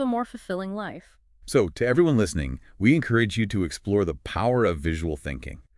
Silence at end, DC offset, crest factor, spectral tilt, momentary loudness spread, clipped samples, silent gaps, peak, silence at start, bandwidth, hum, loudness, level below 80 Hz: 0.15 s; under 0.1%; 18 dB; -6.5 dB/octave; 13 LU; under 0.1%; none; -8 dBFS; 0 s; 12 kHz; none; -25 LUFS; -42 dBFS